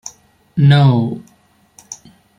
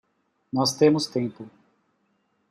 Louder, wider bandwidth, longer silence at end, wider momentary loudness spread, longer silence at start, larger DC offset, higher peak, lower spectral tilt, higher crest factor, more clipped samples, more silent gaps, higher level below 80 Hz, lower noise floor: first, -13 LUFS vs -23 LUFS; second, 7.4 kHz vs 15 kHz; second, 0.45 s vs 1.05 s; first, 24 LU vs 13 LU; second, 0.05 s vs 0.55 s; neither; first, -2 dBFS vs -6 dBFS; first, -6.5 dB/octave vs -5 dB/octave; second, 14 dB vs 20 dB; neither; neither; first, -52 dBFS vs -70 dBFS; second, -54 dBFS vs -70 dBFS